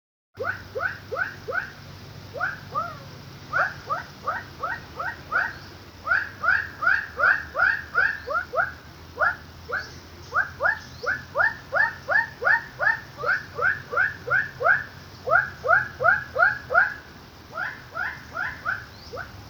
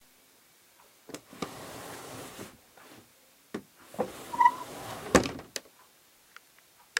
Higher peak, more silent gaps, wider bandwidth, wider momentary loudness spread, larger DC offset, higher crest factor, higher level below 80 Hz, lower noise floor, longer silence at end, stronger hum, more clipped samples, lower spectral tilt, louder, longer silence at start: about the same, -6 dBFS vs -4 dBFS; neither; first, over 20 kHz vs 16 kHz; second, 17 LU vs 27 LU; neither; second, 20 dB vs 30 dB; about the same, -54 dBFS vs -56 dBFS; second, -45 dBFS vs -61 dBFS; about the same, 0 s vs 0 s; neither; neither; about the same, -4 dB/octave vs -3.5 dB/octave; first, -25 LUFS vs -32 LUFS; second, 0.35 s vs 1.1 s